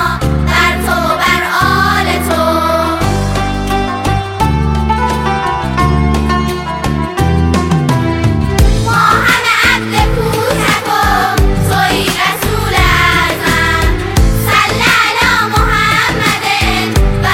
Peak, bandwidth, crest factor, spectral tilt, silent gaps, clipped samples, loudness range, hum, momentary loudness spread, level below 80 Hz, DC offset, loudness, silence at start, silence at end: 0 dBFS; 17 kHz; 12 dB; -4.5 dB/octave; none; under 0.1%; 3 LU; none; 6 LU; -20 dBFS; under 0.1%; -11 LUFS; 0 s; 0 s